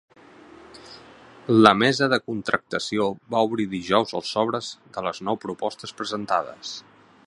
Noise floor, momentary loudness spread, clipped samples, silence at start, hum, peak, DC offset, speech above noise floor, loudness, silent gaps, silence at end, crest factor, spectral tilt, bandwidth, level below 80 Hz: -48 dBFS; 19 LU; under 0.1%; 0.75 s; none; 0 dBFS; under 0.1%; 25 dB; -23 LUFS; none; 0.45 s; 24 dB; -5 dB/octave; 11.5 kHz; -62 dBFS